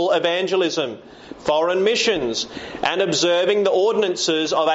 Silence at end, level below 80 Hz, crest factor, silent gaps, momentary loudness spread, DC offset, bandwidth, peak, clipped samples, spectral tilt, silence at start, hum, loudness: 0 s; -56 dBFS; 14 dB; none; 10 LU; under 0.1%; 8 kHz; -6 dBFS; under 0.1%; -2 dB/octave; 0 s; none; -20 LUFS